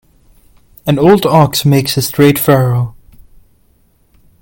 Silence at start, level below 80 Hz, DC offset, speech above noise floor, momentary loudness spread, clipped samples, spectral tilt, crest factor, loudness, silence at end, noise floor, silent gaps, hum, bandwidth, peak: 0.85 s; -42 dBFS; under 0.1%; 43 dB; 9 LU; under 0.1%; -6 dB/octave; 12 dB; -11 LUFS; 1.5 s; -52 dBFS; none; none; 17.5 kHz; 0 dBFS